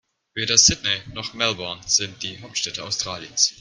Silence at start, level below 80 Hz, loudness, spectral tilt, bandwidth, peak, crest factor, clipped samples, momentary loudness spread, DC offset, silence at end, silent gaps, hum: 0.35 s; -50 dBFS; -20 LUFS; -0.5 dB/octave; 13.5 kHz; 0 dBFS; 24 dB; under 0.1%; 15 LU; under 0.1%; 0.1 s; none; none